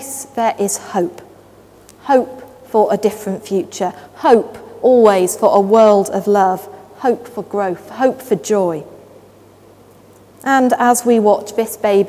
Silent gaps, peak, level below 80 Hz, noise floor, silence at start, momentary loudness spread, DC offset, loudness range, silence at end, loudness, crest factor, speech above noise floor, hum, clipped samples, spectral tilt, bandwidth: none; 0 dBFS; -58 dBFS; -44 dBFS; 0 s; 14 LU; under 0.1%; 7 LU; 0 s; -15 LUFS; 16 dB; 30 dB; none; under 0.1%; -5 dB/octave; 16 kHz